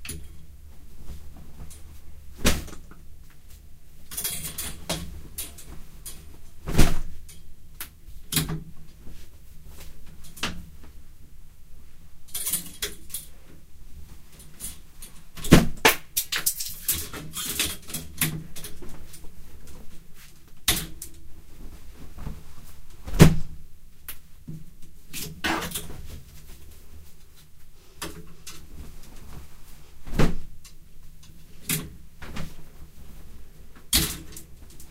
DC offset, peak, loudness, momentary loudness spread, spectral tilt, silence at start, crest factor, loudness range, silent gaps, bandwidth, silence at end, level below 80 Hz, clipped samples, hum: under 0.1%; 0 dBFS; -26 LUFS; 25 LU; -4 dB/octave; 0 s; 28 dB; 13 LU; none; 16 kHz; 0 s; -34 dBFS; under 0.1%; none